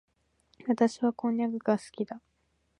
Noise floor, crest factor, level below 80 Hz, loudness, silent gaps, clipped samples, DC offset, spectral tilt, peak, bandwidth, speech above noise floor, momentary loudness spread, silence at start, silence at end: -70 dBFS; 20 dB; -76 dBFS; -30 LUFS; none; under 0.1%; under 0.1%; -6.5 dB/octave; -12 dBFS; 10.5 kHz; 41 dB; 11 LU; 0.65 s; 0.6 s